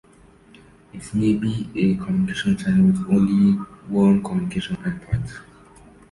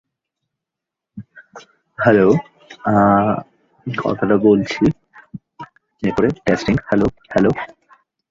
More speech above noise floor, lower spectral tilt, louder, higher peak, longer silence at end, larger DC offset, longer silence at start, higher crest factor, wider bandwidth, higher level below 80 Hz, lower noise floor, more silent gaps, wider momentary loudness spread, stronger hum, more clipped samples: second, 31 dB vs 69 dB; about the same, -7.5 dB/octave vs -7.5 dB/octave; second, -21 LUFS vs -17 LUFS; second, -6 dBFS vs -2 dBFS; about the same, 0.7 s vs 0.65 s; neither; second, 0.95 s vs 1.15 s; about the same, 16 dB vs 16 dB; first, 11.5 kHz vs 7.6 kHz; about the same, -46 dBFS vs -46 dBFS; second, -51 dBFS vs -84 dBFS; neither; second, 11 LU vs 25 LU; neither; neither